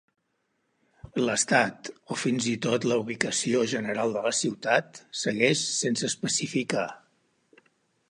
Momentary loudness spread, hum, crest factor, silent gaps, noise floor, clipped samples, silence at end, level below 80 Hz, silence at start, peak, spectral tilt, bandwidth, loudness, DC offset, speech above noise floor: 8 LU; none; 24 dB; none; -75 dBFS; under 0.1%; 1.1 s; -68 dBFS; 1.05 s; -6 dBFS; -3 dB/octave; 11.5 kHz; -26 LUFS; under 0.1%; 48 dB